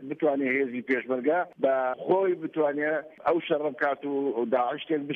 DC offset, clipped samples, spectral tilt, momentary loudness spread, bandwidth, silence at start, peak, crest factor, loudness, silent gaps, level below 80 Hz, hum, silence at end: under 0.1%; under 0.1%; -8 dB/octave; 4 LU; 5 kHz; 0 s; -12 dBFS; 16 dB; -27 LUFS; none; -76 dBFS; none; 0 s